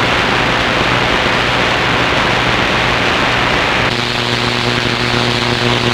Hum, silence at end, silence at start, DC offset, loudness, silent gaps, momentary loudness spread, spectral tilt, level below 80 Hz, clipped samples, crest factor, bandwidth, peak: 60 Hz at -30 dBFS; 0 s; 0 s; under 0.1%; -12 LUFS; none; 2 LU; -4 dB/octave; -32 dBFS; under 0.1%; 14 dB; 16.5 kHz; 0 dBFS